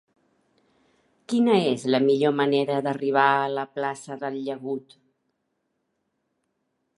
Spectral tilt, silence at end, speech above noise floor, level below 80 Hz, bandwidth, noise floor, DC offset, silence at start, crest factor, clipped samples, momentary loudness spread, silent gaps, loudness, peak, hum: -6 dB/octave; 2.2 s; 53 dB; -78 dBFS; 11.5 kHz; -76 dBFS; under 0.1%; 1.3 s; 20 dB; under 0.1%; 12 LU; none; -24 LUFS; -4 dBFS; none